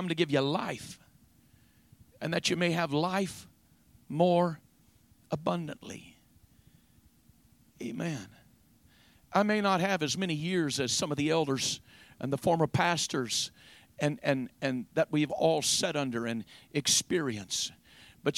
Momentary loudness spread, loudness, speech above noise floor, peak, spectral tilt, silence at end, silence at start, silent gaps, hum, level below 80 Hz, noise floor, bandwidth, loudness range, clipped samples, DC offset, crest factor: 14 LU; -30 LUFS; 33 dB; -10 dBFS; -4 dB/octave; 0 s; 0 s; none; none; -66 dBFS; -64 dBFS; 16.5 kHz; 11 LU; under 0.1%; under 0.1%; 22 dB